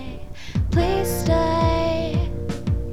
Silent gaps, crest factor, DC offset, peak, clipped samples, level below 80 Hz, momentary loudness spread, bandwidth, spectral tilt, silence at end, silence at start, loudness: none; 14 dB; 2%; -8 dBFS; under 0.1%; -30 dBFS; 9 LU; 16 kHz; -6.5 dB/octave; 0 s; 0 s; -22 LUFS